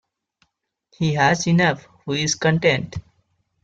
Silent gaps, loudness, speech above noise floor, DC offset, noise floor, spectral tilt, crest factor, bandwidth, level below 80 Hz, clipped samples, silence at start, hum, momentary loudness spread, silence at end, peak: none; -20 LUFS; 50 dB; under 0.1%; -70 dBFS; -4.5 dB/octave; 20 dB; 7.8 kHz; -54 dBFS; under 0.1%; 1 s; none; 13 LU; 0.65 s; -2 dBFS